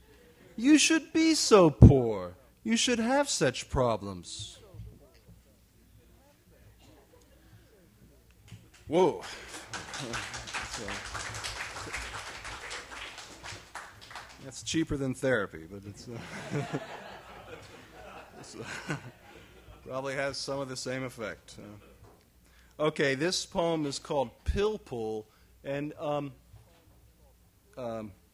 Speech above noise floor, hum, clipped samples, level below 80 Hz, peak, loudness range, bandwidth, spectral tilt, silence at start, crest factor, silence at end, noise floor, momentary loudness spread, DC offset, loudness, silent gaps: 33 dB; none; under 0.1%; -44 dBFS; -2 dBFS; 16 LU; 15 kHz; -5 dB/octave; 0.55 s; 28 dB; 0.2 s; -61 dBFS; 22 LU; under 0.1%; -29 LUFS; none